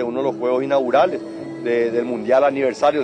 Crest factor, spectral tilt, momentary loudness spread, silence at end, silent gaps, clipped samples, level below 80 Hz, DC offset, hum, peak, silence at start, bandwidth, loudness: 14 dB; -6 dB/octave; 8 LU; 0 s; none; under 0.1%; -62 dBFS; under 0.1%; none; -4 dBFS; 0 s; 9.6 kHz; -19 LUFS